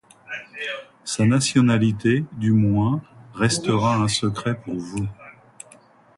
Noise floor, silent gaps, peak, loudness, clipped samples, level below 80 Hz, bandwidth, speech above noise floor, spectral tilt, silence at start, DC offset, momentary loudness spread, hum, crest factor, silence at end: -52 dBFS; none; -4 dBFS; -21 LUFS; under 0.1%; -50 dBFS; 11.5 kHz; 32 dB; -5.5 dB/octave; 0.3 s; under 0.1%; 14 LU; none; 18 dB; 0.85 s